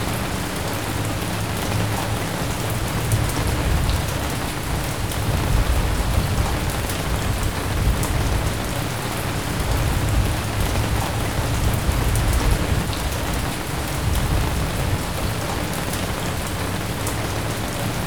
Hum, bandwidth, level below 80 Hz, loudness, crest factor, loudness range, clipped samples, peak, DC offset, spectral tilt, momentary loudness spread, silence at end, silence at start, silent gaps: none; over 20 kHz; -26 dBFS; -23 LUFS; 18 dB; 2 LU; under 0.1%; -4 dBFS; 1%; -4.5 dB/octave; 4 LU; 0 s; 0 s; none